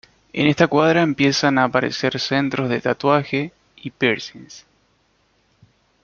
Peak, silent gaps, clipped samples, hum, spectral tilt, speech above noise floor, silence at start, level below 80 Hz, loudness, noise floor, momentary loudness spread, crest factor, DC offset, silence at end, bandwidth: -2 dBFS; none; under 0.1%; none; -5.5 dB/octave; 44 dB; 0.35 s; -58 dBFS; -19 LUFS; -63 dBFS; 16 LU; 18 dB; under 0.1%; 1.45 s; 7.2 kHz